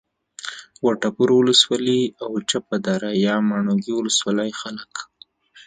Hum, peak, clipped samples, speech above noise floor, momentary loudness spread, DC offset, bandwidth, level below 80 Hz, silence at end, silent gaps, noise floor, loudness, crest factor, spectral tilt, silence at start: none; 0 dBFS; under 0.1%; 29 dB; 18 LU; under 0.1%; 9.6 kHz; -66 dBFS; 0.05 s; none; -49 dBFS; -20 LUFS; 20 dB; -4 dB/octave; 0.45 s